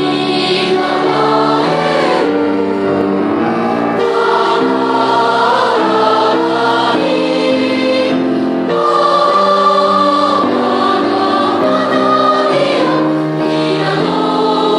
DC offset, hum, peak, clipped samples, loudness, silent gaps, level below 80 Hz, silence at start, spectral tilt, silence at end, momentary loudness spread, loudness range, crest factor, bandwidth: under 0.1%; none; 0 dBFS; under 0.1%; -12 LUFS; none; -56 dBFS; 0 s; -5.5 dB/octave; 0 s; 4 LU; 2 LU; 12 dB; 11 kHz